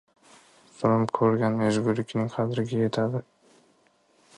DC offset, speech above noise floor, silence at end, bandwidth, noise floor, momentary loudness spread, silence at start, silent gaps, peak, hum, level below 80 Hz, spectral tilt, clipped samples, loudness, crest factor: under 0.1%; 39 dB; 1.15 s; 11 kHz; -64 dBFS; 6 LU; 0.8 s; none; -8 dBFS; none; -64 dBFS; -7.5 dB/octave; under 0.1%; -26 LUFS; 18 dB